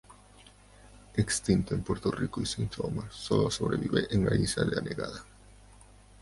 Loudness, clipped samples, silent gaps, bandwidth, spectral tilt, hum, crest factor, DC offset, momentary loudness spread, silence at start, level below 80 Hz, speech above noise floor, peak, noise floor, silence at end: -30 LUFS; under 0.1%; none; 11.5 kHz; -5.5 dB/octave; 50 Hz at -45 dBFS; 20 dB; under 0.1%; 9 LU; 0.1 s; -48 dBFS; 26 dB; -12 dBFS; -56 dBFS; 0.45 s